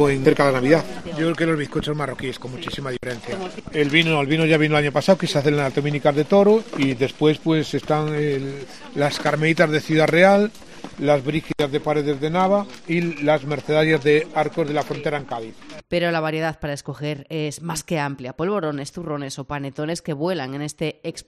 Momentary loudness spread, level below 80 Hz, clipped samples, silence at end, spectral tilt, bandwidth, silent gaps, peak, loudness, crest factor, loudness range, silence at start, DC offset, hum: 12 LU; -50 dBFS; under 0.1%; 0.05 s; -6 dB/octave; 13.5 kHz; none; 0 dBFS; -21 LUFS; 20 dB; 8 LU; 0 s; 0.6%; none